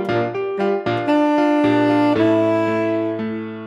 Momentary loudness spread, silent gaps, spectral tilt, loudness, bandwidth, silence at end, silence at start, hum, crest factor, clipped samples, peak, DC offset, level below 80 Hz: 7 LU; none; -7.5 dB/octave; -18 LUFS; 7.6 kHz; 0 s; 0 s; none; 14 dB; under 0.1%; -4 dBFS; under 0.1%; -58 dBFS